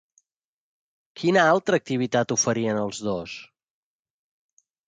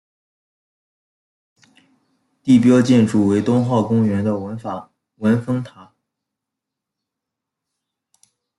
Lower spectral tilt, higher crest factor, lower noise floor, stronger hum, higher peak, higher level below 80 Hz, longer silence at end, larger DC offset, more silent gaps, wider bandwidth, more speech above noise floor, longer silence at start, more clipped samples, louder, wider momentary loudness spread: second, -4 dB/octave vs -7.5 dB/octave; about the same, 20 dB vs 18 dB; about the same, -80 dBFS vs -83 dBFS; neither; second, -6 dBFS vs -2 dBFS; about the same, -64 dBFS vs -62 dBFS; second, 1.45 s vs 2.75 s; neither; neither; second, 10 kHz vs 11.5 kHz; second, 58 dB vs 67 dB; second, 1.15 s vs 2.45 s; neither; second, -23 LUFS vs -17 LUFS; second, 12 LU vs 16 LU